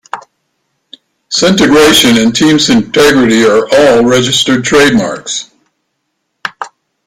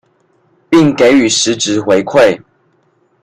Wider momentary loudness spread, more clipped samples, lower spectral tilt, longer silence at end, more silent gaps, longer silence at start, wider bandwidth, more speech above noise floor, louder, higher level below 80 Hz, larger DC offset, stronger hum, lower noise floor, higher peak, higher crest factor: first, 18 LU vs 5 LU; first, 0.1% vs under 0.1%; about the same, -3.5 dB/octave vs -4 dB/octave; second, 0.4 s vs 0.85 s; neither; second, 0.15 s vs 0.7 s; first, 16.5 kHz vs 12 kHz; first, 60 dB vs 46 dB; first, -7 LUFS vs -10 LUFS; first, -40 dBFS vs -50 dBFS; neither; neither; first, -67 dBFS vs -56 dBFS; about the same, 0 dBFS vs 0 dBFS; about the same, 10 dB vs 12 dB